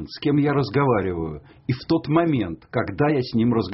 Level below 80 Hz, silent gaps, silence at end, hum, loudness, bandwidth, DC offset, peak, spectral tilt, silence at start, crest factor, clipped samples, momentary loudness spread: -48 dBFS; none; 0 s; none; -22 LUFS; 6 kHz; under 0.1%; -6 dBFS; -6.5 dB/octave; 0 s; 16 dB; under 0.1%; 9 LU